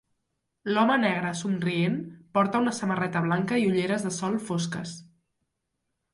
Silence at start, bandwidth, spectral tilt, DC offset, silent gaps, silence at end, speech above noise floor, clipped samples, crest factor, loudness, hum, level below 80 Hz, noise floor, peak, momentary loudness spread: 0.65 s; 11.5 kHz; -5.5 dB/octave; under 0.1%; none; 1.1 s; 54 dB; under 0.1%; 18 dB; -26 LUFS; none; -70 dBFS; -80 dBFS; -10 dBFS; 10 LU